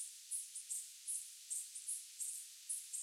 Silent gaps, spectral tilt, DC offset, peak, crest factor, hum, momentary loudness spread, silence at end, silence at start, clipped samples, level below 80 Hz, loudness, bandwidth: none; 9.5 dB/octave; under 0.1%; -30 dBFS; 18 dB; none; 2 LU; 0 s; 0 s; under 0.1%; under -90 dBFS; -44 LUFS; 16.5 kHz